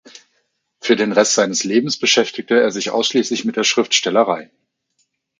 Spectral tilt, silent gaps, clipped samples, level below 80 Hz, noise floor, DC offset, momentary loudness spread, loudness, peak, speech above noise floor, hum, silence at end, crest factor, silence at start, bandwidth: -2.5 dB/octave; none; under 0.1%; -68 dBFS; -68 dBFS; under 0.1%; 5 LU; -16 LUFS; 0 dBFS; 51 dB; none; 0.95 s; 18 dB; 0.85 s; 9.6 kHz